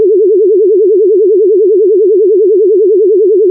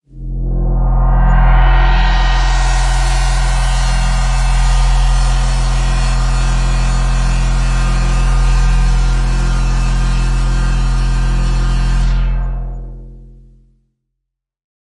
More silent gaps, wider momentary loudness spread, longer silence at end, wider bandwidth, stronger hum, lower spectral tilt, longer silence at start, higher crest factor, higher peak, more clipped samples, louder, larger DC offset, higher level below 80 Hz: neither; second, 0 LU vs 5 LU; second, 0 s vs 1.75 s; second, 0.6 kHz vs 11 kHz; neither; first, -14.5 dB/octave vs -5 dB/octave; second, 0 s vs 0.15 s; second, 4 dB vs 12 dB; about the same, -2 dBFS vs -2 dBFS; neither; first, -7 LUFS vs -16 LUFS; neither; second, -82 dBFS vs -12 dBFS